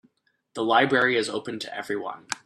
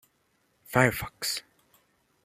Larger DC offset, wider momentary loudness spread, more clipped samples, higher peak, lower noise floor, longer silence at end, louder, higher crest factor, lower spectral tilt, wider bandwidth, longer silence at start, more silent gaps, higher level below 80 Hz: neither; first, 13 LU vs 8 LU; neither; about the same, -6 dBFS vs -6 dBFS; second, -67 dBFS vs -71 dBFS; second, 0.1 s vs 0.85 s; first, -24 LUFS vs -27 LUFS; second, 20 dB vs 26 dB; about the same, -3.5 dB/octave vs -4 dB/octave; second, 13.5 kHz vs 15.5 kHz; second, 0.55 s vs 0.7 s; neither; second, -72 dBFS vs -56 dBFS